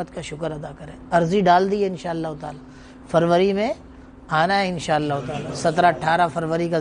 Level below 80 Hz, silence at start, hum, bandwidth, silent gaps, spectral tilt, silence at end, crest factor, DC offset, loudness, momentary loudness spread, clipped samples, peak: -50 dBFS; 0 s; none; 10 kHz; none; -6 dB/octave; 0 s; 18 dB; under 0.1%; -21 LUFS; 16 LU; under 0.1%; -4 dBFS